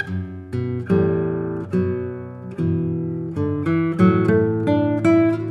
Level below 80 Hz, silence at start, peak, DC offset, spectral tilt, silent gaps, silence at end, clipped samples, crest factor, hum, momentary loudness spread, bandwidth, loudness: -52 dBFS; 0 s; -2 dBFS; under 0.1%; -9.5 dB/octave; none; 0 s; under 0.1%; 18 dB; none; 11 LU; 9.6 kHz; -20 LUFS